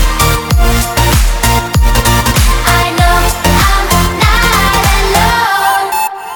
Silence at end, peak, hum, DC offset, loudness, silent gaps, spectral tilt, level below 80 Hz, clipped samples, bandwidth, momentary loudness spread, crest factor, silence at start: 0 s; 0 dBFS; none; under 0.1%; -10 LUFS; none; -3.5 dB/octave; -14 dBFS; under 0.1%; over 20 kHz; 3 LU; 10 dB; 0 s